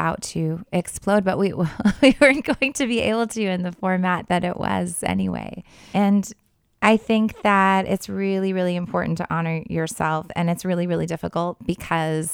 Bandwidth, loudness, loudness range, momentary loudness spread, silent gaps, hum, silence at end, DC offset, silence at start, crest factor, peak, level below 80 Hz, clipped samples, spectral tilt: 16.5 kHz; -22 LUFS; 4 LU; 9 LU; none; none; 0 s; under 0.1%; 0 s; 22 dB; 0 dBFS; -48 dBFS; under 0.1%; -5.5 dB/octave